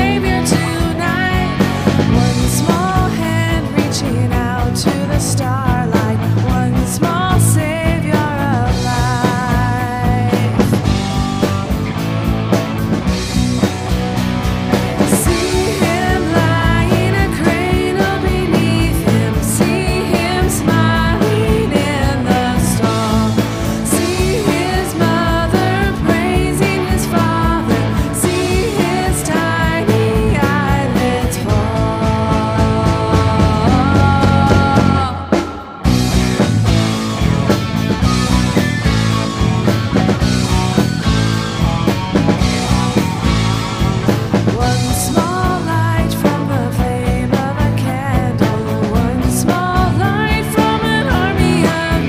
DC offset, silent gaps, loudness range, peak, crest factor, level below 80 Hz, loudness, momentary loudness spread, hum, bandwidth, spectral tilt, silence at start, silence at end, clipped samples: under 0.1%; none; 2 LU; 0 dBFS; 14 dB; -24 dBFS; -15 LUFS; 4 LU; none; 16 kHz; -5.5 dB/octave; 0 s; 0 s; under 0.1%